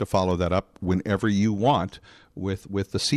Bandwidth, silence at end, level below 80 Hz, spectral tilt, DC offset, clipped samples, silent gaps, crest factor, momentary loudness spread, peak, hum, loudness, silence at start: 13 kHz; 0 s; -48 dBFS; -6 dB/octave; under 0.1%; under 0.1%; none; 18 dB; 10 LU; -6 dBFS; none; -25 LUFS; 0 s